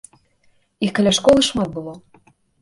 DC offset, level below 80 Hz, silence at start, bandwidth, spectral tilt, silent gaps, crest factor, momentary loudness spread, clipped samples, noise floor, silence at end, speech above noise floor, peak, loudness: under 0.1%; -48 dBFS; 0.8 s; 11.5 kHz; -4 dB/octave; none; 18 dB; 16 LU; under 0.1%; -60 dBFS; 0.65 s; 42 dB; -2 dBFS; -17 LUFS